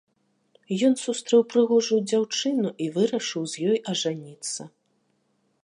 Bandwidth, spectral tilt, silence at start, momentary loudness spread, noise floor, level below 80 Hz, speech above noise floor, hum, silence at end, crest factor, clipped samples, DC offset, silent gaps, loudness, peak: 11 kHz; -4.5 dB/octave; 0.7 s; 11 LU; -70 dBFS; -80 dBFS; 46 dB; none; 0.95 s; 16 dB; under 0.1%; under 0.1%; none; -24 LUFS; -8 dBFS